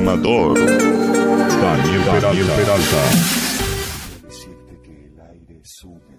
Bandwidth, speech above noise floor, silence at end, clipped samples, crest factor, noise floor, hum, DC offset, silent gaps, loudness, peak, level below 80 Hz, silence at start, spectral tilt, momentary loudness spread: 16 kHz; 29 dB; 0.25 s; under 0.1%; 14 dB; -44 dBFS; none; under 0.1%; none; -15 LUFS; -4 dBFS; -36 dBFS; 0 s; -4.5 dB/octave; 10 LU